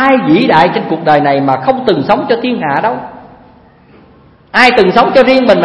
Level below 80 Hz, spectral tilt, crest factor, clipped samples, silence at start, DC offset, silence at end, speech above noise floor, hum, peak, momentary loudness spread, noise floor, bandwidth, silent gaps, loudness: -44 dBFS; -6.5 dB/octave; 10 dB; 0.7%; 0 s; under 0.1%; 0 s; 33 dB; none; 0 dBFS; 7 LU; -42 dBFS; 11 kHz; none; -9 LUFS